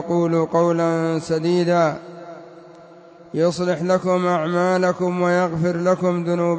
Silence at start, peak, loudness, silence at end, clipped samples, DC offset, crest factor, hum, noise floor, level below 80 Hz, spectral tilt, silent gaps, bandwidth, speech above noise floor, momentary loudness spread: 0 s; -6 dBFS; -20 LUFS; 0 s; under 0.1%; under 0.1%; 14 dB; none; -44 dBFS; -60 dBFS; -7 dB/octave; none; 8 kHz; 25 dB; 8 LU